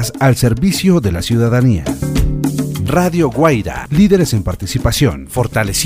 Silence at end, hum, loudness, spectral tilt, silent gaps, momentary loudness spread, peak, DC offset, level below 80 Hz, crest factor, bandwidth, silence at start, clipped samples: 0 s; none; -14 LUFS; -5.5 dB/octave; none; 6 LU; 0 dBFS; under 0.1%; -26 dBFS; 14 dB; 16 kHz; 0 s; under 0.1%